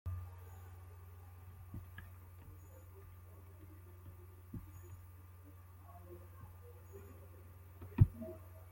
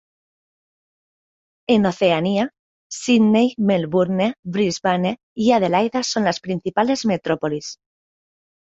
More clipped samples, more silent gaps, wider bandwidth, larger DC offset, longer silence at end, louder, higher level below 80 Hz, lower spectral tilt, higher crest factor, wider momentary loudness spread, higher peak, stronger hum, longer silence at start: neither; second, none vs 2.59-2.90 s, 4.39-4.43 s, 5.23-5.36 s; first, 16.5 kHz vs 8 kHz; neither; second, 0 s vs 1 s; second, -44 LUFS vs -19 LUFS; about the same, -56 dBFS vs -60 dBFS; first, -8.5 dB/octave vs -5.5 dB/octave; first, 30 dB vs 18 dB; about the same, 10 LU vs 9 LU; second, -14 dBFS vs -4 dBFS; neither; second, 0.05 s vs 1.7 s